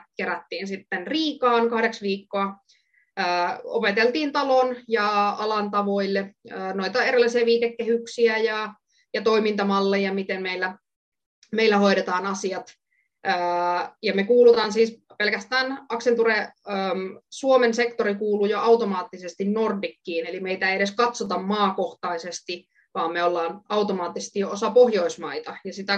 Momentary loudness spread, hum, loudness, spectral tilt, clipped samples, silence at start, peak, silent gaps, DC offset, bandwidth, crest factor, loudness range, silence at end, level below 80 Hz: 11 LU; none; -23 LUFS; -4.5 dB/octave; under 0.1%; 0.2 s; -6 dBFS; 10.96-11.12 s, 11.26-11.42 s; under 0.1%; 8.8 kHz; 18 dB; 4 LU; 0 s; -74 dBFS